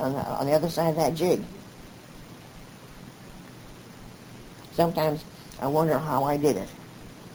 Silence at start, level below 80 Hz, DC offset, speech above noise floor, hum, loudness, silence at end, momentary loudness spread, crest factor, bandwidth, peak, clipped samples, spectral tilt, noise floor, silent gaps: 0 s; -54 dBFS; under 0.1%; 21 dB; none; -26 LUFS; 0 s; 22 LU; 20 dB; over 20 kHz; -8 dBFS; under 0.1%; -6 dB/octave; -46 dBFS; none